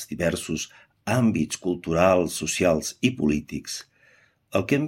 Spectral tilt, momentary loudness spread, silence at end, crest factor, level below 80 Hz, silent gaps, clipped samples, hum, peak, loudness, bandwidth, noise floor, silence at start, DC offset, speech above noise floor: -5 dB/octave; 12 LU; 0 s; 20 dB; -52 dBFS; none; under 0.1%; none; -6 dBFS; -24 LUFS; 16.5 kHz; -59 dBFS; 0 s; under 0.1%; 36 dB